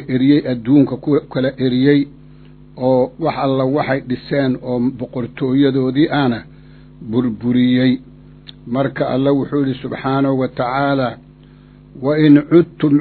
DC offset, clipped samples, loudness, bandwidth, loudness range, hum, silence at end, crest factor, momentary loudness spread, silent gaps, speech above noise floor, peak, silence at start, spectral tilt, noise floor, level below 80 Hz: under 0.1%; under 0.1%; -16 LUFS; 4.5 kHz; 3 LU; none; 0 s; 16 dB; 9 LU; none; 27 dB; 0 dBFS; 0 s; -11 dB/octave; -42 dBFS; -48 dBFS